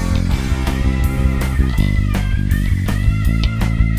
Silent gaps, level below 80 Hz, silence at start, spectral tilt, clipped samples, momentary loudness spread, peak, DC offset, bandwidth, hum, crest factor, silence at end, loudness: none; -18 dBFS; 0 s; -6.5 dB/octave; under 0.1%; 2 LU; -2 dBFS; under 0.1%; 15.5 kHz; none; 14 dB; 0 s; -18 LUFS